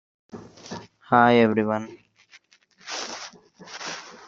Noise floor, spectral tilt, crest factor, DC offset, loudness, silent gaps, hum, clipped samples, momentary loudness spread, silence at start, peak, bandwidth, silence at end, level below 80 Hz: -57 dBFS; -5 dB/octave; 24 dB; under 0.1%; -22 LUFS; none; none; under 0.1%; 27 LU; 0.35 s; -2 dBFS; 7.6 kHz; 0.15 s; -66 dBFS